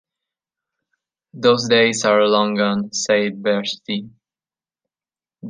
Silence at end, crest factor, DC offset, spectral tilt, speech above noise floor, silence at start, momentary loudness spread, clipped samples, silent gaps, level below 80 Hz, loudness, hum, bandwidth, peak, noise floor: 0 s; 18 dB; under 0.1%; -3.5 dB/octave; over 72 dB; 1.35 s; 10 LU; under 0.1%; none; -68 dBFS; -18 LUFS; none; 9.8 kHz; -2 dBFS; under -90 dBFS